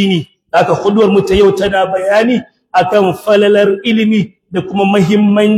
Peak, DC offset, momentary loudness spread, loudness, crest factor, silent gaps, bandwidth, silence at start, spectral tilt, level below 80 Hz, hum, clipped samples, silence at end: 0 dBFS; under 0.1%; 7 LU; -11 LUFS; 10 dB; none; 14 kHz; 0 s; -6.5 dB/octave; -38 dBFS; none; under 0.1%; 0 s